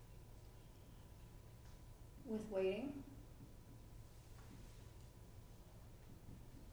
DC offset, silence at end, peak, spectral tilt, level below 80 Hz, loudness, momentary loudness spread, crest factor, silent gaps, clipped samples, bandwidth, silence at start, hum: under 0.1%; 0 s; -30 dBFS; -6.5 dB/octave; -62 dBFS; -52 LUFS; 19 LU; 22 dB; none; under 0.1%; over 20 kHz; 0 s; none